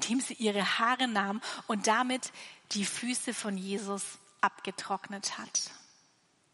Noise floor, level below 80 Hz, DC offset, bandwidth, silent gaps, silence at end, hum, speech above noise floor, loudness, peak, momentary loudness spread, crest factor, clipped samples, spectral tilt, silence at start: -69 dBFS; -86 dBFS; under 0.1%; 11.5 kHz; none; 0.75 s; none; 36 dB; -32 LUFS; -12 dBFS; 10 LU; 20 dB; under 0.1%; -2.5 dB/octave; 0 s